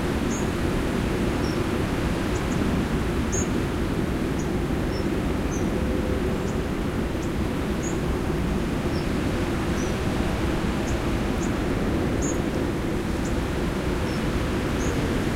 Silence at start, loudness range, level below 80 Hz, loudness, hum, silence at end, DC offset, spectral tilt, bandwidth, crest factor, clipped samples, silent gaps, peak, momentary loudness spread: 0 s; 1 LU; -32 dBFS; -26 LUFS; none; 0 s; under 0.1%; -6 dB/octave; 16 kHz; 14 dB; under 0.1%; none; -10 dBFS; 2 LU